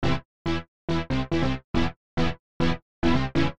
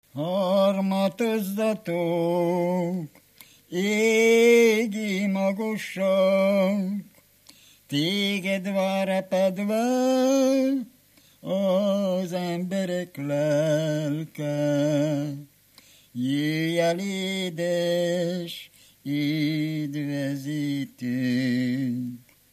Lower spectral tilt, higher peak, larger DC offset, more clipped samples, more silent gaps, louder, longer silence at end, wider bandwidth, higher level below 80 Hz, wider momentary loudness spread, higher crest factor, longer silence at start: about the same, -6.5 dB/octave vs -5.5 dB/octave; about the same, -8 dBFS vs -8 dBFS; first, 2% vs under 0.1%; neither; first, 0.25-0.45 s, 0.68-0.88 s, 1.64-1.74 s, 1.96-2.17 s, 2.39-2.60 s, 2.82-3.02 s vs none; second, -28 LUFS vs -25 LUFS; second, 0 s vs 0.35 s; second, 9.2 kHz vs 15 kHz; first, -38 dBFS vs -76 dBFS; second, 6 LU vs 10 LU; about the same, 16 dB vs 16 dB; second, 0 s vs 0.15 s